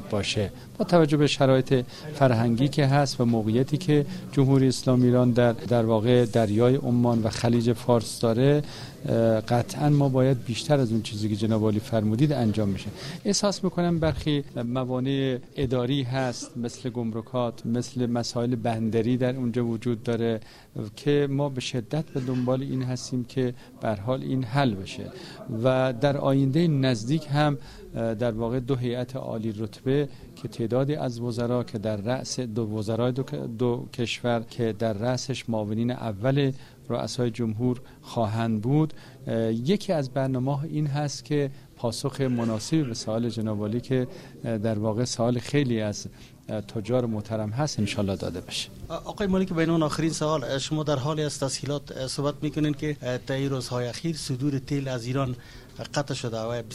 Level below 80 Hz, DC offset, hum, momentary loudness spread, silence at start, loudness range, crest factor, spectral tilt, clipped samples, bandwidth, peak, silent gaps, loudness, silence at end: -52 dBFS; under 0.1%; none; 10 LU; 0 s; 6 LU; 20 dB; -6.5 dB/octave; under 0.1%; 14 kHz; -6 dBFS; none; -26 LUFS; 0 s